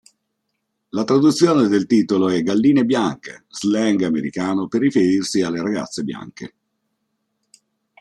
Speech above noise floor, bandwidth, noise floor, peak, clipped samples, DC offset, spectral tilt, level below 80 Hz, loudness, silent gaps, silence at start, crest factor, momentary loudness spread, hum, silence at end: 57 dB; 12 kHz; -74 dBFS; -2 dBFS; under 0.1%; under 0.1%; -5.5 dB/octave; -62 dBFS; -18 LUFS; none; 0.95 s; 18 dB; 14 LU; none; 1.55 s